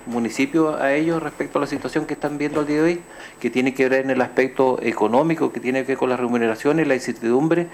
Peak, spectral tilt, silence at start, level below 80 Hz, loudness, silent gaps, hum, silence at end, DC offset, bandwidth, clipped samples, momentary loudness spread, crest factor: -6 dBFS; -6 dB/octave; 0 s; -56 dBFS; -21 LUFS; none; none; 0 s; under 0.1%; 14.5 kHz; under 0.1%; 6 LU; 16 dB